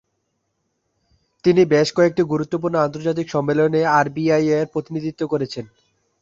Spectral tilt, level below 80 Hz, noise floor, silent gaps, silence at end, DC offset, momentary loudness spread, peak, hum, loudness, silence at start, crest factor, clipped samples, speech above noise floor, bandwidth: -6.5 dB/octave; -58 dBFS; -72 dBFS; none; 0.55 s; under 0.1%; 9 LU; -2 dBFS; none; -19 LUFS; 1.45 s; 18 dB; under 0.1%; 54 dB; 7.8 kHz